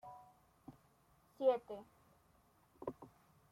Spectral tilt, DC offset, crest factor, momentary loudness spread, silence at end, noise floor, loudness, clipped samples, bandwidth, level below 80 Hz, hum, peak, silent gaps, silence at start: -6.5 dB/octave; under 0.1%; 22 dB; 25 LU; 0.45 s; -72 dBFS; -41 LUFS; under 0.1%; 14 kHz; -78 dBFS; none; -22 dBFS; none; 0.05 s